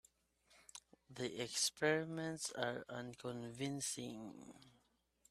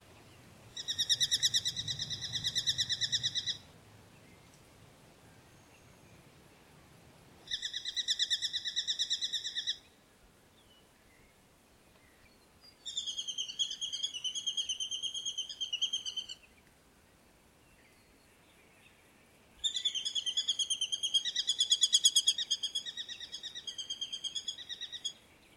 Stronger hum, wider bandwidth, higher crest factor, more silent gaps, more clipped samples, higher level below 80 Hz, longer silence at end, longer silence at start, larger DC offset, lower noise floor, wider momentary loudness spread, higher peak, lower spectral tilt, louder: neither; about the same, 15 kHz vs 16 kHz; about the same, 24 dB vs 26 dB; neither; neither; second, -80 dBFS vs -70 dBFS; first, 0.6 s vs 0.4 s; first, 0.5 s vs 0.1 s; neither; first, -78 dBFS vs -64 dBFS; first, 20 LU vs 13 LU; second, -20 dBFS vs -10 dBFS; first, -3 dB/octave vs 1 dB/octave; second, -42 LUFS vs -32 LUFS